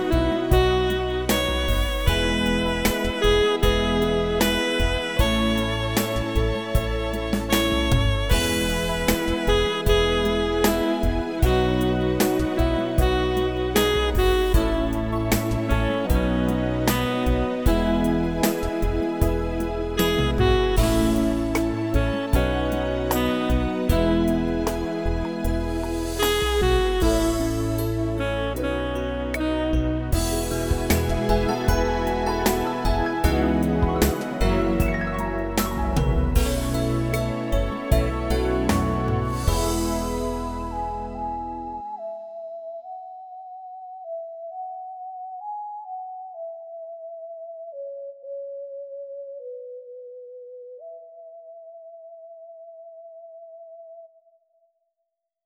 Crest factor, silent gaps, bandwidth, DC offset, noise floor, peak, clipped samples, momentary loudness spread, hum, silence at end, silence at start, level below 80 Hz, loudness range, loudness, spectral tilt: 18 dB; none; over 20 kHz; under 0.1%; -80 dBFS; -4 dBFS; under 0.1%; 17 LU; none; 1.4 s; 0 s; -28 dBFS; 15 LU; -23 LUFS; -5.5 dB/octave